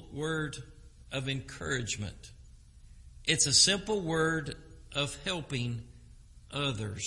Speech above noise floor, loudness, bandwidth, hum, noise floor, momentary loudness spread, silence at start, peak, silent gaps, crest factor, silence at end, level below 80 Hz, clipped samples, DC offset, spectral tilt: 22 dB; -30 LUFS; 11.5 kHz; none; -54 dBFS; 19 LU; 0 s; -10 dBFS; none; 24 dB; 0 s; -52 dBFS; under 0.1%; under 0.1%; -2.5 dB/octave